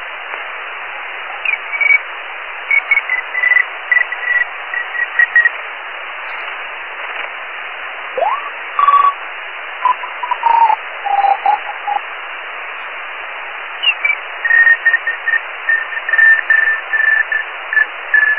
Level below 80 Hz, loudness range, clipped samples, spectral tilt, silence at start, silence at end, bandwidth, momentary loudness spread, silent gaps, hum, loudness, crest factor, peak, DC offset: -64 dBFS; 6 LU; under 0.1%; -2 dB/octave; 0 s; 0 s; 4.9 kHz; 15 LU; none; none; -14 LUFS; 16 dB; 0 dBFS; 0.7%